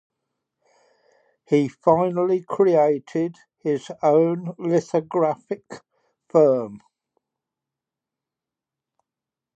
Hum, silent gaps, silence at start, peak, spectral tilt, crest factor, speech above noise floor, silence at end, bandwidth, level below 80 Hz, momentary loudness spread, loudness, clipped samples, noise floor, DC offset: none; none; 1.5 s; -4 dBFS; -8 dB/octave; 20 dB; 67 dB; 2.8 s; 8.6 kHz; -68 dBFS; 13 LU; -21 LUFS; under 0.1%; -88 dBFS; under 0.1%